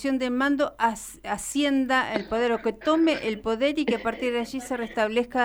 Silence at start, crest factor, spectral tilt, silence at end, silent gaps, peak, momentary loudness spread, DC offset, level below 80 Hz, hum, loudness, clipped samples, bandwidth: 0 s; 16 dB; -3.5 dB/octave; 0 s; none; -8 dBFS; 8 LU; under 0.1%; -54 dBFS; none; -25 LUFS; under 0.1%; 19.5 kHz